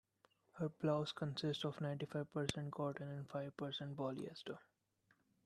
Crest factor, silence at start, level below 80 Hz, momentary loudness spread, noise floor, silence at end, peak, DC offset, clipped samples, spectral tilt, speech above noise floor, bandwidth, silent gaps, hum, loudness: 24 dB; 0.55 s; -76 dBFS; 9 LU; -79 dBFS; 0.85 s; -20 dBFS; under 0.1%; under 0.1%; -6 dB/octave; 36 dB; 12.5 kHz; none; none; -44 LUFS